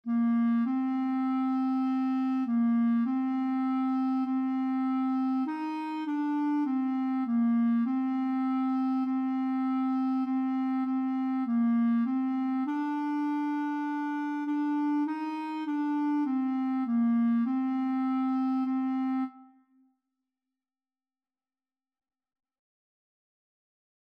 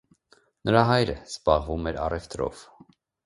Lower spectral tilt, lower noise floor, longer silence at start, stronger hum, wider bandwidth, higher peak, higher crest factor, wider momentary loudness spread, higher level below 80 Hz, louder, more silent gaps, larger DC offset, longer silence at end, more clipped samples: first, -7.5 dB/octave vs -6 dB/octave; first, under -90 dBFS vs -63 dBFS; second, 0.05 s vs 0.65 s; neither; second, 5.6 kHz vs 11.5 kHz; second, -20 dBFS vs -2 dBFS; second, 8 dB vs 24 dB; second, 5 LU vs 12 LU; second, under -90 dBFS vs -42 dBFS; second, -29 LUFS vs -25 LUFS; neither; neither; first, 4.7 s vs 0.65 s; neither